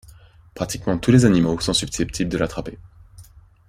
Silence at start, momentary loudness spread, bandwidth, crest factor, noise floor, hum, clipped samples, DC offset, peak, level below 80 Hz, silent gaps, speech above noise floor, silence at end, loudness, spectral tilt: 0.55 s; 15 LU; 15.5 kHz; 20 dB; -48 dBFS; none; under 0.1%; under 0.1%; -2 dBFS; -40 dBFS; none; 28 dB; 0.45 s; -20 LUFS; -5.5 dB/octave